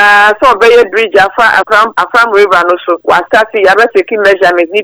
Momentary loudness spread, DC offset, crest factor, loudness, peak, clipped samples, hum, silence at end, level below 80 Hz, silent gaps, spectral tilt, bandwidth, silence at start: 4 LU; under 0.1%; 6 dB; -7 LUFS; 0 dBFS; 4%; none; 0 s; -44 dBFS; none; -3 dB/octave; over 20 kHz; 0 s